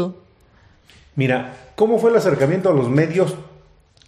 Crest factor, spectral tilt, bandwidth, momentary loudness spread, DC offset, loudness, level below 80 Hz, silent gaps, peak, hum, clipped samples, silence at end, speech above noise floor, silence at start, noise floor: 16 dB; -7.5 dB/octave; 14 kHz; 13 LU; under 0.1%; -18 LUFS; -56 dBFS; none; -4 dBFS; none; under 0.1%; 0.65 s; 35 dB; 0 s; -53 dBFS